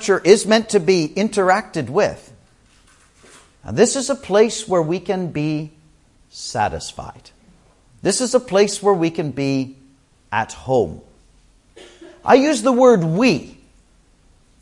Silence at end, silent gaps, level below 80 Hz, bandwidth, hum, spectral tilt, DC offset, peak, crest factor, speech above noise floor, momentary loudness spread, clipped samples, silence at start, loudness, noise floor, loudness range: 1.1 s; none; -52 dBFS; 11.5 kHz; none; -4.5 dB/octave; under 0.1%; 0 dBFS; 20 dB; 37 dB; 14 LU; under 0.1%; 0 s; -18 LUFS; -54 dBFS; 6 LU